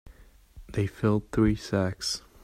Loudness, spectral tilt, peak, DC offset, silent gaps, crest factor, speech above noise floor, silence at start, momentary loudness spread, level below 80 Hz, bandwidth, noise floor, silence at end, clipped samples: -28 LUFS; -5.5 dB/octave; -10 dBFS; under 0.1%; none; 18 dB; 26 dB; 0.05 s; 6 LU; -44 dBFS; 15 kHz; -53 dBFS; 0.25 s; under 0.1%